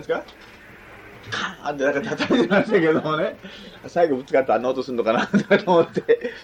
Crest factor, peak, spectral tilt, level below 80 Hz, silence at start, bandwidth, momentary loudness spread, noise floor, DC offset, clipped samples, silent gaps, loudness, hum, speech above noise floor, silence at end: 16 dB; -4 dBFS; -6 dB/octave; -58 dBFS; 0 s; 9.4 kHz; 10 LU; -44 dBFS; under 0.1%; under 0.1%; none; -21 LUFS; none; 22 dB; 0 s